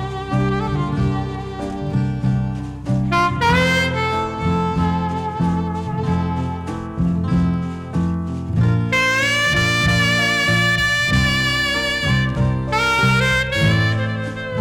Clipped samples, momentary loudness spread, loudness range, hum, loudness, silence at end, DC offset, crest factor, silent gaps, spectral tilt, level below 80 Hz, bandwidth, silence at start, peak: under 0.1%; 9 LU; 5 LU; none; -18 LUFS; 0 s; under 0.1%; 12 dB; none; -5 dB/octave; -34 dBFS; 16.5 kHz; 0 s; -6 dBFS